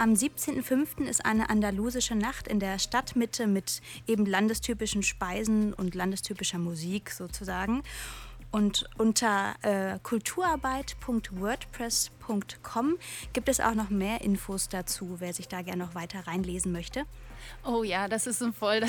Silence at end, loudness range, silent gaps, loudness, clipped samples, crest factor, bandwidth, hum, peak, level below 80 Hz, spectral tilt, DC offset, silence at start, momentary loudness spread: 0 s; 4 LU; none; -30 LUFS; under 0.1%; 18 dB; 19 kHz; none; -12 dBFS; -48 dBFS; -3.5 dB/octave; under 0.1%; 0 s; 9 LU